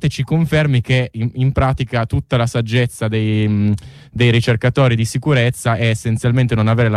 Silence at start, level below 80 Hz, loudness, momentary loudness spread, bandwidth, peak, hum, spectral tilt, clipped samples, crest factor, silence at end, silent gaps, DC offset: 0 s; -36 dBFS; -16 LUFS; 4 LU; 13 kHz; -4 dBFS; none; -6.5 dB/octave; under 0.1%; 12 dB; 0 s; none; under 0.1%